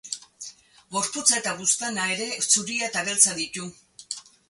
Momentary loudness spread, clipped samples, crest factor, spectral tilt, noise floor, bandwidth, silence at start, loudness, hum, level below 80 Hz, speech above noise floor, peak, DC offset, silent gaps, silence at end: 18 LU; under 0.1%; 24 dB; -0.5 dB/octave; -45 dBFS; 12 kHz; 0.05 s; -22 LUFS; none; -70 dBFS; 20 dB; -2 dBFS; under 0.1%; none; 0.3 s